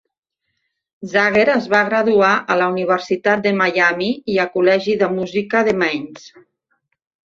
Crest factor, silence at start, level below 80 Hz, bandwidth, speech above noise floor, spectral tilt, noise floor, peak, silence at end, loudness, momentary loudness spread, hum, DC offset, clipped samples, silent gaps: 16 dB; 1 s; -60 dBFS; 7.6 kHz; 59 dB; -5.5 dB/octave; -76 dBFS; -2 dBFS; 1 s; -16 LUFS; 7 LU; none; under 0.1%; under 0.1%; none